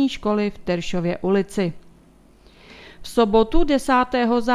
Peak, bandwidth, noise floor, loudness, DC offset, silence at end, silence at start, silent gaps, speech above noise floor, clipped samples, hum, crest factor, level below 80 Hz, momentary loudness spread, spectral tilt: -4 dBFS; 14 kHz; -51 dBFS; -21 LUFS; under 0.1%; 0 s; 0 s; none; 32 dB; under 0.1%; none; 18 dB; -36 dBFS; 8 LU; -6 dB/octave